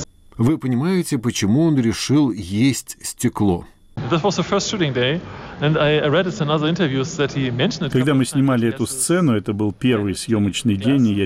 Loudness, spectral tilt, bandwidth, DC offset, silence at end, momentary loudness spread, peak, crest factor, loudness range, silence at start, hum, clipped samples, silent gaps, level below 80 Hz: -19 LUFS; -5.5 dB/octave; 16 kHz; under 0.1%; 0 s; 6 LU; -8 dBFS; 10 dB; 2 LU; 0 s; none; under 0.1%; none; -48 dBFS